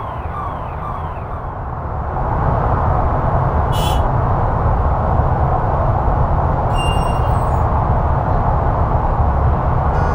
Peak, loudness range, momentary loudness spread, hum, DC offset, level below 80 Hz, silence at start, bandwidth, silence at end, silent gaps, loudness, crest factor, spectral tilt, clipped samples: -2 dBFS; 3 LU; 8 LU; none; under 0.1%; -20 dBFS; 0 s; 16 kHz; 0 s; none; -18 LUFS; 14 dB; -7.5 dB/octave; under 0.1%